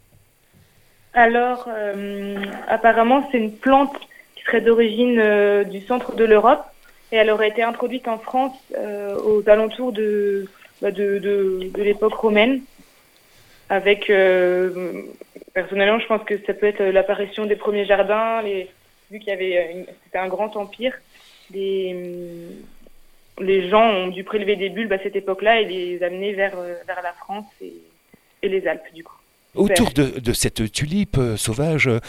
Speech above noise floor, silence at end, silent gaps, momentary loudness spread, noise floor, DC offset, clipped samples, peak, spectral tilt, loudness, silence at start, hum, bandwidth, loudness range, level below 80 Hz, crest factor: 36 dB; 0 s; none; 14 LU; -56 dBFS; under 0.1%; under 0.1%; 0 dBFS; -5 dB/octave; -20 LUFS; 1.15 s; none; 16 kHz; 8 LU; -46 dBFS; 20 dB